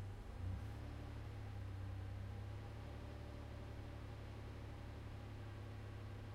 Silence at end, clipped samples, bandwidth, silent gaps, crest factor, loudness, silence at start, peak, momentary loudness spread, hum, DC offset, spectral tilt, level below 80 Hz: 0 s; under 0.1%; 14 kHz; none; 14 dB; -52 LUFS; 0 s; -36 dBFS; 3 LU; none; under 0.1%; -7 dB/octave; -54 dBFS